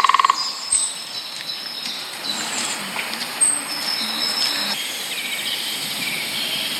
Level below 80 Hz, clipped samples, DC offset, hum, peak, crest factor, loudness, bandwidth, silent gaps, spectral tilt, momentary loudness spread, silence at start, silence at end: -68 dBFS; under 0.1%; under 0.1%; none; 0 dBFS; 24 dB; -21 LUFS; 18 kHz; none; 0.5 dB/octave; 9 LU; 0 s; 0 s